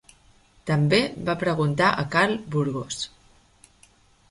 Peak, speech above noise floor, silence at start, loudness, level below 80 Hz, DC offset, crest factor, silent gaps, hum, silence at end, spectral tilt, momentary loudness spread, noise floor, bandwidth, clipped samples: -6 dBFS; 34 dB; 0.65 s; -24 LUFS; -56 dBFS; under 0.1%; 20 dB; none; none; 1.25 s; -5.5 dB/octave; 11 LU; -58 dBFS; 11.5 kHz; under 0.1%